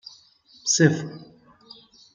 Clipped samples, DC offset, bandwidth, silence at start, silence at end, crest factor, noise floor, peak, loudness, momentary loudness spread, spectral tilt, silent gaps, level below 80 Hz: under 0.1%; under 0.1%; 9.6 kHz; 0.65 s; 0.9 s; 24 dB; -55 dBFS; -4 dBFS; -21 LUFS; 26 LU; -4 dB/octave; none; -66 dBFS